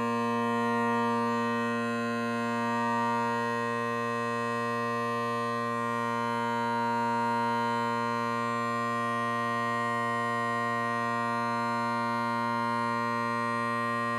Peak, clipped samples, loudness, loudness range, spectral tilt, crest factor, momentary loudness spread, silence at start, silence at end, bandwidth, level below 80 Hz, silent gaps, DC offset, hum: -20 dBFS; under 0.1%; -29 LUFS; 1 LU; -5.5 dB/octave; 10 dB; 2 LU; 0 s; 0 s; 14.5 kHz; -76 dBFS; none; under 0.1%; none